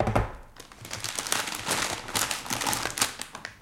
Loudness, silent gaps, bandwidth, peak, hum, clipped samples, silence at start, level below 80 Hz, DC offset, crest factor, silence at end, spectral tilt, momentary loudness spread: -29 LUFS; none; 17 kHz; -4 dBFS; none; under 0.1%; 0 s; -44 dBFS; under 0.1%; 26 dB; 0 s; -2 dB/octave; 11 LU